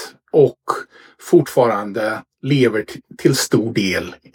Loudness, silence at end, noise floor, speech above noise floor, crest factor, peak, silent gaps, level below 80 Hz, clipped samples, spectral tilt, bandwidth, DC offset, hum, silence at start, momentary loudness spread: -18 LUFS; 0.2 s; -37 dBFS; 20 dB; 18 dB; 0 dBFS; none; -58 dBFS; under 0.1%; -5.5 dB/octave; 18.5 kHz; under 0.1%; none; 0 s; 10 LU